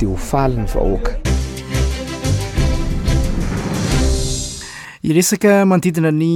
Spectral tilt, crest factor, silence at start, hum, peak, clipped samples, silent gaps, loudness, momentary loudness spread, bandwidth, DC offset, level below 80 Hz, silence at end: -5.5 dB/octave; 14 dB; 0 s; none; -2 dBFS; under 0.1%; none; -18 LUFS; 10 LU; 18.5 kHz; under 0.1%; -22 dBFS; 0 s